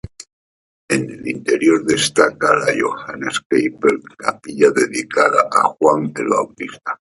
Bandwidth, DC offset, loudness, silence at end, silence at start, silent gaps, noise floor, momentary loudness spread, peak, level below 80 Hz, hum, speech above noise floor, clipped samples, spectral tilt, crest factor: 11.5 kHz; under 0.1%; -17 LUFS; 0.05 s; 0.2 s; 0.33-0.88 s, 3.46-3.50 s; under -90 dBFS; 10 LU; 0 dBFS; -54 dBFS; none; over 73 dB; under 0.1%; -4 dB/octave; 18 dB